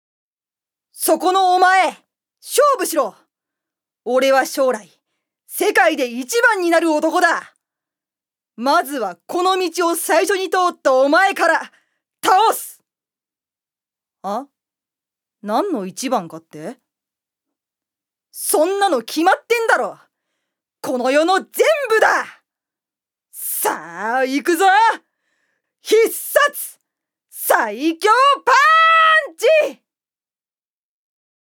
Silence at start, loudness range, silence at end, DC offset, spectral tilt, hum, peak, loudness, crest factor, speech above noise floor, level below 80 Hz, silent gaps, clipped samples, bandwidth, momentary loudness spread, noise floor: 0.95 s; 11 LU; 1.85 s; under 0.1%; -2 dB/octave; none; 0 dBFS; -16 LUFS; 18 dB; over 74 dB; -78 dBFS; none; under 0.1%; over 20 kHz; 14 LU; under -90 dBFS